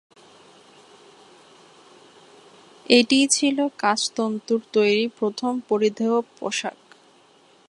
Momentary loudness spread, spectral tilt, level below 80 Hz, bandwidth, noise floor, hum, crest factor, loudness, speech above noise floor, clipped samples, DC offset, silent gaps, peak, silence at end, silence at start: 10 LU; -2.5 dB/octave; -76 dBFS; 11.5 kHz; -55 dBFS; none; 22 dB; -21 LUFS; 34 dB; under 0.1%; under 0.1%; none; -2 dBFS; 1 s; 2.9 s